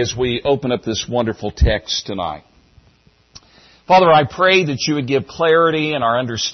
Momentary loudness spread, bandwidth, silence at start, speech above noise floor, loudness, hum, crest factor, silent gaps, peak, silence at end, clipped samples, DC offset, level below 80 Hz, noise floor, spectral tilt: 9 LU; 6.4 kHz; 0 s; 37 dB; -16 LUFS; none; 14 dB; none; -2 dBFS; 0 s; under 0.1%; under 0.1%; -30 dBFS; -54 dBFS; -4.5 dB/octave